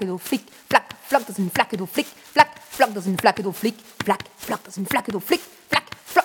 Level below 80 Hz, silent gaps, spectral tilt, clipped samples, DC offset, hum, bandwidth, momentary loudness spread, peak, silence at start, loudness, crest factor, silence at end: -62 dBFS; none; -4 dB/octave; under 0.1%; under 0.1%; none; 18 kHz; 8 LU; -2 dBFS; 0 s; -23 LUFS; 22 dB; 0 s